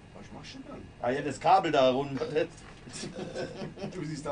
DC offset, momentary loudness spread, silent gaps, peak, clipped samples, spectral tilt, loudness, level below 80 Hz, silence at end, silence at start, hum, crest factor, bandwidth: under 0.1%; 20 LU; none; -10 dBFS; under 0.1%; -5 dB/octave; -30 LUFS; -58 dBFS; 0 s; 0 s; none; 20 dB; 10.5 kHz